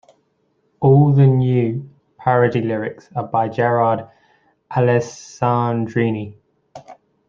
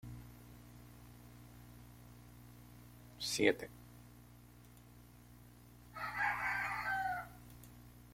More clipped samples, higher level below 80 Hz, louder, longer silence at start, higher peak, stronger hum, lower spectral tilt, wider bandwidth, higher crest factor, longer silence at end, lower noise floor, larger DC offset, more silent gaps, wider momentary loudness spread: neither; first, -58 dBFS vs -64 dBFS; first, -18 LUFS vs -38 LUFS; first, 0.8 s vs 0.05 s; first, -2 dBFS vs -14 dBFS; second, none vs 60 Hz at -60 dBFS; first, -8.5 dB/octave vs -3.5 dB/octave; second, 7.2 kHz vs 16.5 kHz; second, 16 dB vs 28 dB; first, 0.35 s vs 0 s; first, -65 dBFS vs -60 dBFS; neither; neither; second, 13 LU vs 25 LU